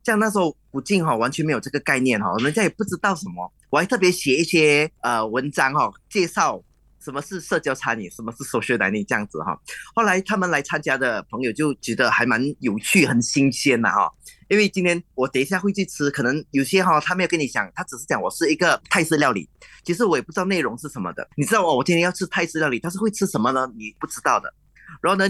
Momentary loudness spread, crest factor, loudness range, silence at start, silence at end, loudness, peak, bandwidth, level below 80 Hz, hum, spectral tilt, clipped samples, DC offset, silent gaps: 11 LU; 18 dB; 4 LU; 0.05 s; 0 s; -21 LUFS; -4 dBFS; 12.5 kHz; -58 dBFS; none; -4.5 dB/octave; under 0.1%; under 0.1%; none